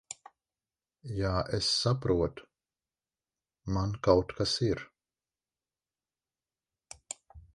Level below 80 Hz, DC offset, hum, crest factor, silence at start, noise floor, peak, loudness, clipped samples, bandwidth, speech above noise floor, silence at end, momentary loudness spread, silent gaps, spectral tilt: -50 dBFS; under 0.1%; none; 24 dB; 0.1 s; under -90 dBFS; -10 dBFS; -30 LUFS; under 0.1%; 11.5 kHz; over 61 dB; 0.15 s; 20 LU; none; -5 dB/octave